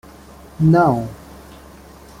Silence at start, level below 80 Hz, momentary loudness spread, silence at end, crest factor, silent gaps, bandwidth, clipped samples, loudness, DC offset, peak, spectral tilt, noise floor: 0.6 s; -44 dBFS; 26 LU; 1.05 s; 18 dB; none; 15 kHz; under 0.1%; -16 LUFS; under 0.1%; -2 dBFS; -9 dB/octave; -41 dBFS